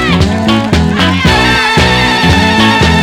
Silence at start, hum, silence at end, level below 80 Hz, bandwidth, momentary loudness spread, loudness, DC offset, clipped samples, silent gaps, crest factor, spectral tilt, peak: 0 s; none; 0 s; -20 dBFS; 17 kHz; 3 LU; -8 LUFS; under 0.1%; 0.7%; none; 8 dB; -5 dB/octave; 0 dBFS